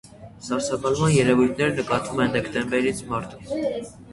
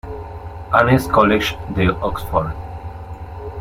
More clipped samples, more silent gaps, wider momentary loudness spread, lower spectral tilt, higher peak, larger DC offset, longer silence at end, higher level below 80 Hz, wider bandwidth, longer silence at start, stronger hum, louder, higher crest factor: neither; neither; second, 11 LU vs 19 LU; about the same, -5.5 dB/octave vs -6.5 dB/octave; second, -4 dBFS vs 0 dBFS; neither; about the same, 0 s vs 0 s; second, -50 dBFS vs -34 dBFS; second, 11.5 kHz vs 16.5 kHz; about the same, 0.05 s vs 0.05 s; neither; second, -23 LUFS vs -17 LUFS; about the same, 20 dB vs 18 dB